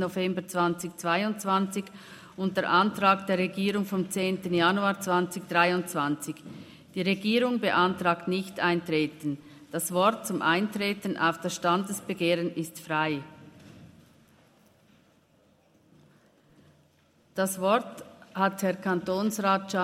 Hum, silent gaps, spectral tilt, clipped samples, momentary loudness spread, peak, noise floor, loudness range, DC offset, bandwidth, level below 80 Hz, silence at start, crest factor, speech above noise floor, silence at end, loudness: none; none; -4.5 dB/octave; under 0.1%; 12 LU; -8 dBFS; -64 dBFS; 8 LU; under 0.1%; 16 kHz; -72 dBFS; 0 s; 22 dB; 36 dB; 0 s; -27 LUFS